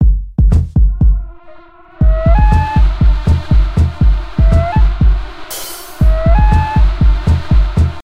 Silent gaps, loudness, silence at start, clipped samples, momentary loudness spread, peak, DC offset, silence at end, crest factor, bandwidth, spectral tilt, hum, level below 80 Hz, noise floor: none; -13 LUFS; 0 s; under 0.1%; 8 LU; 0 dBFS; 1%; 0 s; 10 dB; 16 kHz; -7.5 dB/octave; none; -12 dBFS; -38 dBFS